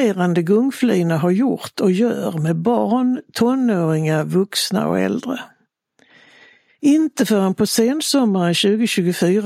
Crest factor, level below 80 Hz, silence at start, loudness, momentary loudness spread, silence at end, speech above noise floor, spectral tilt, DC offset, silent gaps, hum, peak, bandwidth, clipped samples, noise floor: 14 dB; -64 dBFS; 0 s; -18 LUFS; 4 LU; 0 s; 43 dB; -5.5 dB/octave; under 0.1%; none; none; -4 dBFS; 16 kHz; under 0.1%; -60 dBFS